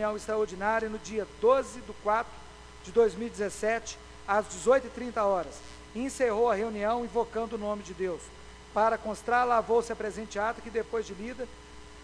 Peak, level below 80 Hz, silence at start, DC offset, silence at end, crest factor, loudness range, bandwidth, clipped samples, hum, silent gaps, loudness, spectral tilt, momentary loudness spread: -12 dBFS; -54 dBFS; 0 s; under 0.1%; 0 s; 18 dB; 1 LU; 11 kHz; under 0.1%; none; none; -30 LUFS; -4.5 dB/octave; 16 LU